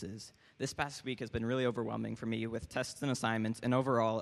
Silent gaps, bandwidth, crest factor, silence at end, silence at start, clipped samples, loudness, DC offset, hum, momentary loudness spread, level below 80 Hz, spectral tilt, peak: none; 13 kHz; 20 dB; 0 s; 0 s; under 0.1%; -36 LUFS; under 0.1%; none; 10 LU; -60 dBFS; -5.5 dB/octave; -16 dBFS